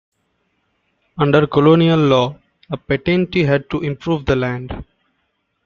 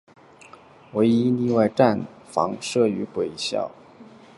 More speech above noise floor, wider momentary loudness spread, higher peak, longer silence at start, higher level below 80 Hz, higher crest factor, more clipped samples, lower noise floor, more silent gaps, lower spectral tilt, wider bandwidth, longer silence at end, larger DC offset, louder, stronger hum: first, 53 dB vs 27 dB; first, 17 LU vs 10 LU; about the same, 0 dBFS vs -2 dBFS; first, 1.15 s vs 0.95 s; first, -42 dBFS vs -62 dBFS; second, 16 dB vs 22 dB; neither; first, -69 dBFS vs -48 dBFS; neither; first, -8 dB/octave vs -6 dB/octave; second, 7 kHz vs 11.5 kHz; first, 0.8 s vs 0.35 s; neither; first, -16 LUFS vs -23 LUFS; neither